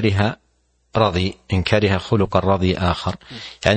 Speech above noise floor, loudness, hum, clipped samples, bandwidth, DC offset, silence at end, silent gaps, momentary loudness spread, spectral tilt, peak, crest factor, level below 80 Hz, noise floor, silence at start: 45 dB; -20 LUFS; none; under 0.1%; 8.8 kHz; under 0.1%; 0 s; none; 10 LU; -6.5 dB/octave; 0 dBFS; 20 dB; -40 dBFS; -63 dBFS; 0 s